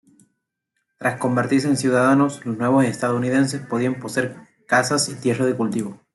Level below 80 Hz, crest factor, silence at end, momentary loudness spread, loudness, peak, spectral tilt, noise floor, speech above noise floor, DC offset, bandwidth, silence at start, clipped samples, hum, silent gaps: -64 dBFS; 16 dB; 0.2 s; 8 LU; -20 LUFS; -4 dBFS; -5 dB/octave; -76 dBFS; 56 dB; under 0.1%; 12 kHz; 1 s; under 0.1%; none; none